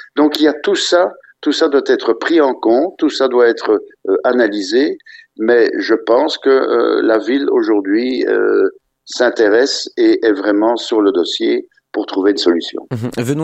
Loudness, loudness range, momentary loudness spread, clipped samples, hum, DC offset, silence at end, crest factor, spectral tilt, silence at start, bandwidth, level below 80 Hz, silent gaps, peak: -14 LUFS; 1 LU; 7 LU; under 0.1%; none; under 0.1%; 0 s; 14 dB; -4.5 dB/octave; 0.15 s; 12.5 kHz; -60 dBFS; none; 0 dBFS